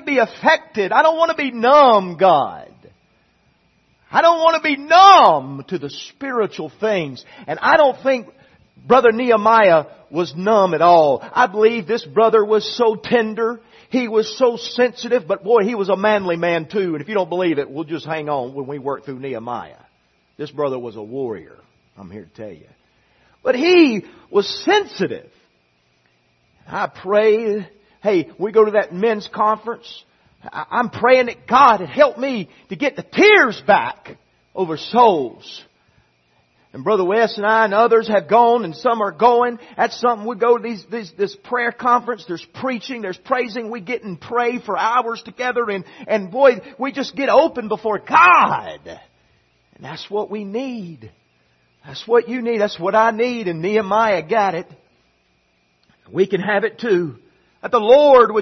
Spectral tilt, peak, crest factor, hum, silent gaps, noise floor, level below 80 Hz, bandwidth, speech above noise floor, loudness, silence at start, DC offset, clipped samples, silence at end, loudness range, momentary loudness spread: -5 dB/octave; 0 dBFS; 18 dB; none; none; -62 dBFS; -62 dBFS; 6.4 kHz; 45 dB; -17 LUFS; 0.05 s; under 0.1%; under 0.1%; 0 s; 9 LU; 16 LU